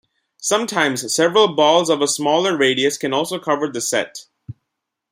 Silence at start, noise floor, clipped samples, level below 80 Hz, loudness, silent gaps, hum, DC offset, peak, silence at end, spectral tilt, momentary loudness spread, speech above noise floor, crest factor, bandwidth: 0.4 s; -79 dBFS; under 0.1%; -66 dBFS; -17 LUFS; none; none; under 0.1%; -2 dBFS; 0.6 s; -2.5 dB/octave; 7 LU; 61 dB; 18 dB; 16 kHz